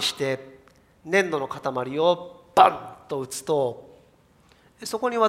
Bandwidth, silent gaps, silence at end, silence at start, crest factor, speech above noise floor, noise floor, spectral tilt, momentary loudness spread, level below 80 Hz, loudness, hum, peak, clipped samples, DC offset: 16 kHz; none; 0 s; 0 s; 24 dB; 35 dB; -58 dBFS; -3.5 dB/octave; 15 LU; -66 dBFS; -24 LUFS; none; -2 dBFS; under 0.1%; under 0.1%